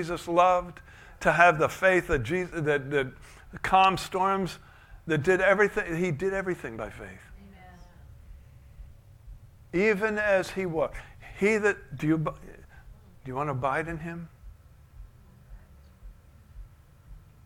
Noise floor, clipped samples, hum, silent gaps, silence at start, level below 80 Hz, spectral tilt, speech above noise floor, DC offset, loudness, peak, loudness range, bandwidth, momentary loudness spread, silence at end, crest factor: -52 dBFS; under 0.1%; none; none; 0 s; -50 dBFS; -5.5 dB/octave; 25 dB; under 0.1%; -26 LUFS; -4 dBFS; 11 LU; 16.5 kHz; 22 LU; 0.25 s; 24 dB